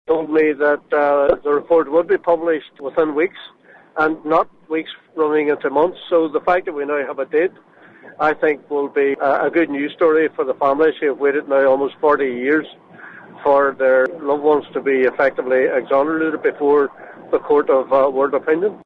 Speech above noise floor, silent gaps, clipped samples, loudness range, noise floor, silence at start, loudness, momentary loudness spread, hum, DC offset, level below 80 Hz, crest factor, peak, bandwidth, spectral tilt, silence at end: 22 dB; none; under 0.1%; 3 LU; -39 dBFS; 0.1 s; -18 LUFS; 7 LU; none; under 0.1%; -58 dBFS; 18 dB; 0 dBFS; 4.9 kHz; -7.5 dB/octave; 0.1 s